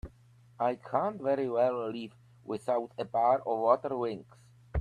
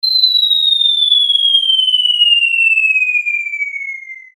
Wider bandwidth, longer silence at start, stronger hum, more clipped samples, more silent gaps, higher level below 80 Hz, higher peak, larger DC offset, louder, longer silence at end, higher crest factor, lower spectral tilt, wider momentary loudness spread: second, 10.5 kHz vs 16.5 kHz; about the same, 0.05 s vs 0.05 s; neither; neither; neither; first, -58 dBFS vs -82 dBFS; second, -12 dBFS vs -2 dBFS; neither; second, -31 LUFS vs -10 LUFS; second, 0 s vs 0.15 s; first, 20 dB vs 12 dB; first, -7.5 dB/octave vs 7.5 dB/octave; first, 15 LU vs 10 LU